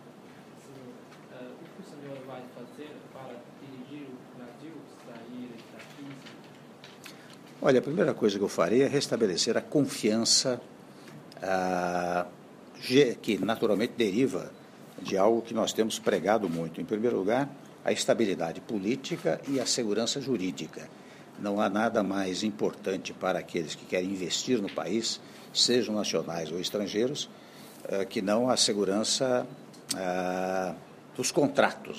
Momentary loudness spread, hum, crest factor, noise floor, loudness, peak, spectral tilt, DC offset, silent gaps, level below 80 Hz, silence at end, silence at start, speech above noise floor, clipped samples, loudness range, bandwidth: 22 LU; none; 24 dB; -50 dBFS; -28 LUFS; -6 dBFS; -3.5 dB/octave; under 0.1%; none; -74 dBFS; 0 s; 0 s; 21 dB; under 0.1%; 18 LU; 15.5 kHz